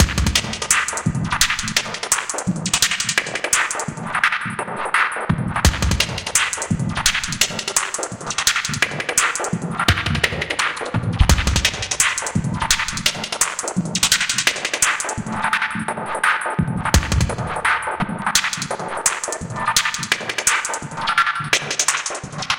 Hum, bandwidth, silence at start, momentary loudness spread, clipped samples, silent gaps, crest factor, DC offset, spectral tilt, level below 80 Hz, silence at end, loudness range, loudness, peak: none; 17 kHz; 0 s; 7 LU; under 0.1%; none; 20 dB; under 0.1%; -2.5 dB/octave; -30 dBFS; 0 s; 1 LU; -19 LUFS; 0 dBFS